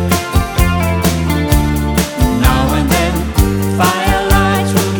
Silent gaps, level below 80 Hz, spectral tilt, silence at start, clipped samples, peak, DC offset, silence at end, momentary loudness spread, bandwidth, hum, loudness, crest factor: none; -18 dBFS; -5 dB/octave; 0 s; under 0.1%; 0 dBFS; under 0.1%; 0 s; 3 LU; 20 kHz; none; -13 LUFS; 12 dB